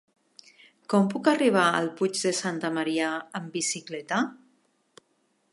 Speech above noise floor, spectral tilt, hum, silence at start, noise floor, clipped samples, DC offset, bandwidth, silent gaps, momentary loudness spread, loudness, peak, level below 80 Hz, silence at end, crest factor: 45 dB; -4 dB/octave; none; 0.9 s; -71 dBFS; under 0.1%; under 0.1%; 11.5 kHz; none; 10 LU; -26 LUFS; -6 dBFS; -80 dBFS; 1.2 s; 22 dB